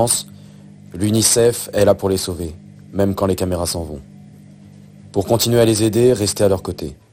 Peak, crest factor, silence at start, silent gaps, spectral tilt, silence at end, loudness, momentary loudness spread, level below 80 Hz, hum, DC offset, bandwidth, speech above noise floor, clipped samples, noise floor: -2 dBFS; 18 dB; 0 s; none; -4.5 dB/octave; 0.2 s; -17 LUFS; 16 LU; -42 dBFS; none; under 0.1%; 16.5 kHz; 25 dB; under 0.1%; -41 dBFS